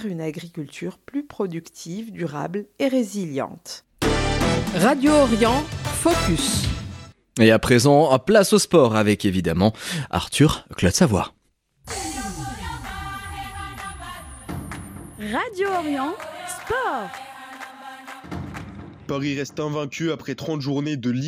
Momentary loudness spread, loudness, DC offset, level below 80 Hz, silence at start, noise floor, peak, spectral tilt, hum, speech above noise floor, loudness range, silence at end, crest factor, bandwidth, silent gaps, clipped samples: 19 LU; -21 LUFS; under 0.1%; -40 dBFS; 0 s; -61 dBFS; -2 dBFS; -5 dB/octave; none; 40 dB; 13 LU; 0 s; 20 dB; 16.5 kHz; none; under 0.1%